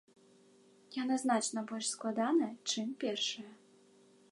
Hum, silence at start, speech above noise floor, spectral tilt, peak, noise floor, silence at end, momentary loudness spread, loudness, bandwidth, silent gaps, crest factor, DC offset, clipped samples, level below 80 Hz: none; 0.9 s; 29 dB; -2.5 dB/octave; -18 dBFS; -64 dBFS; 0.8 s; 9 LU; -35 LUFS; 11.5 kHz; none; 20 dB; under 0.1%; under 0.1%; under -90 dBFS